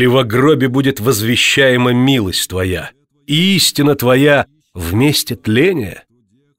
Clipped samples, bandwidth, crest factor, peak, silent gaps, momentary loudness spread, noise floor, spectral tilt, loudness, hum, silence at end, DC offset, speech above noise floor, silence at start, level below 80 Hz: under 0.1%; 16.5 kHz; 12 dB; 0 dBFS; none; 10 LU; -57 dBFS; -4.5 dB/octave; -13 LUFS; none; 0.6 s; under 0.1%; 45 dB; 0 s; -42 dBFS